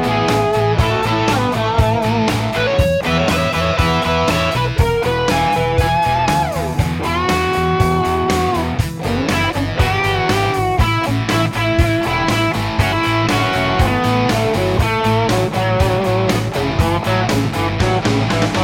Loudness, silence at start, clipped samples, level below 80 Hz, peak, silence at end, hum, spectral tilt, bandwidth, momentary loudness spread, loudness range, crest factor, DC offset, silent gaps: -16 LUFS; 0 s; under 0.1%; -28 dBFS; -2 dBFS; 0 s; none; -5.5 dB/octave; 17 kHz; 2 LU; 1 LU; 14 dB; under 0.1%; none